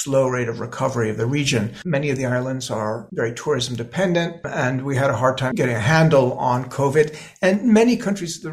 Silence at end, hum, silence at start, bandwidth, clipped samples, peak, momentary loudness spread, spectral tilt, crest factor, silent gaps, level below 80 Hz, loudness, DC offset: 0 s; none; 0 s; 14.5 kHz; under 0.1%; -2 dBFS; 9 LU; -5.5 dB/octave; 18 dB; none; -52 dBFS; -20 LUFS; under 0.1%